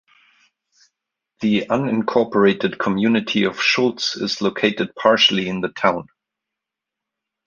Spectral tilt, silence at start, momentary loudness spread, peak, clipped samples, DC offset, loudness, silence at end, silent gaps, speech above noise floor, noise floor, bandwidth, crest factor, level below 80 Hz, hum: -4.5 dB/octave; 1.4 s; 7 LU; -2 dBFS; under 0.1%; under 0.1%; -19 LUFS; 1.45 s; none; 66 dB; -85 dBFS; 7.4 kHz; 18 dB; -60 dBFS; none